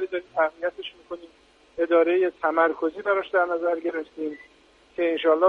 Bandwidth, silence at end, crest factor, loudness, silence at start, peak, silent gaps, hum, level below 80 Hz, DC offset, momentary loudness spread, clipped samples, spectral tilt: 5.6 kHz; 0 s; 18 dB; -24 LUFS; 0 s; -8 dBFS; none; none; -68 dBFS; under 0.1%; 18 LU; under 0.1%; -5.5 dB/octave